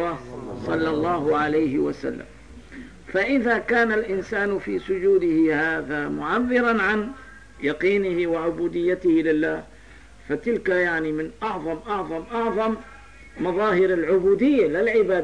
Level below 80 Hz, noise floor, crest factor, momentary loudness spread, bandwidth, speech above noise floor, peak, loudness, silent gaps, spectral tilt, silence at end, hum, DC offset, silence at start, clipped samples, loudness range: -50 dBFS; -47 dBFS; 14 dB; 11 LU; 10 kHz; 25 dB; -10 dBFS; -23 LUFS; none; -7 dB/octave; 0 s; none; 0.3%; 0 s; under 0.1%; 4 LU